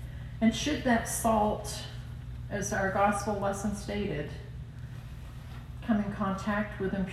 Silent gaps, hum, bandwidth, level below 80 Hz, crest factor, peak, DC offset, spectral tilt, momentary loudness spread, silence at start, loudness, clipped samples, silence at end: none; 60 Hz at -45 dBFS; 14 kHz; -46 dBFS; 18 dB; -14 dBFS; under 0.1%; -5 dB/octave; 16 LU; 0 s; -31 LUFS; under 0.1%; 0 s